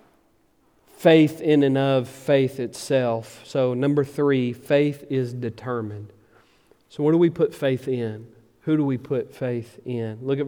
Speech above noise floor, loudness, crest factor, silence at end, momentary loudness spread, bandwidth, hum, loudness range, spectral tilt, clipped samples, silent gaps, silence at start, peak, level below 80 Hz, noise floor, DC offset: 40 dB; -23 LUFS; 20 dB; 0 s; 12 LU; 17.5 kHz; none; 4 LU; -7 dB/octave; under 0.1%; none; 1 s; -4 dBFS; -68 dBFS; -62 dBFS; under 0.1%